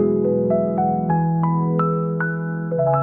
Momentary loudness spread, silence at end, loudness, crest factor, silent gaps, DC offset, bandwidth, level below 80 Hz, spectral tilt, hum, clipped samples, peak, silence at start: 4 LU; 0 s; -20 LUFS; 12 dB; none; 0.2%; 2.8 kHz; -56 dBFS; -14 dB/octave; none; under 0.1%; -6 dBFS; 0 s